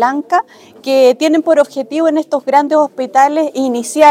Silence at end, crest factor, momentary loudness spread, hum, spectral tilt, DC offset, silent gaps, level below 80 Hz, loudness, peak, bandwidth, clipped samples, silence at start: 0 s; 12 dB; 6 LU; none; -3 dB/octave; under 0.1%; none; -64 dBFS; -13 LUFS; 0 dBFS; 16 kHz; 0.1%; 0 s